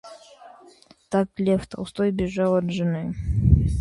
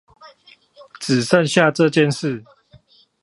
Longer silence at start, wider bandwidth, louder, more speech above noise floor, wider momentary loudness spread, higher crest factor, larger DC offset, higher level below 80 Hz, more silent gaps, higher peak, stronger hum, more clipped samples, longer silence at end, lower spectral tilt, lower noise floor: second, 0.05 s vs 0.25 s; about the same, 11.5 kHz vs 11.5 kHz; second, -24 LUFS vs -17 LUFS; second, 29 dB vs 35 dB; second, 7 LU vs 13 LU; about the same, 20 dB vs 20 dB; neither; first, -32 dBFS vs -64 dBFS; neither; about the same, -2 dBFS vs 0 dBFS; neither; neither; second, 0 s vs 0.8 s; first, -8 dB/octave vs -5 dB/octave; about the same, -52 dBFS vs -52 dBFS